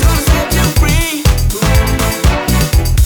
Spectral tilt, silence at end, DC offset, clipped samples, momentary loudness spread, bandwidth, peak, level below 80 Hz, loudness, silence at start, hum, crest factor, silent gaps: -4.5 dB/octave; 0 s; under 0.1%; under 0.1%; 2 LU; over 20 kHz; 0 dBFS; -14 dBFS; -12 LUFS; 0 s; none; 10 dB; none